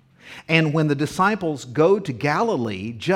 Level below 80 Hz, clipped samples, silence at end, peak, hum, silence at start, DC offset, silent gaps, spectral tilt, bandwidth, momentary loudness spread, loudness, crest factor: -58 dBFS; under 0.1%; 0 s; 0 dBFS; none; 0.25 s; under 0.1%; none; -6 dB/octave; 14 kHz; 9 LU; -21 LUFS; 20 dB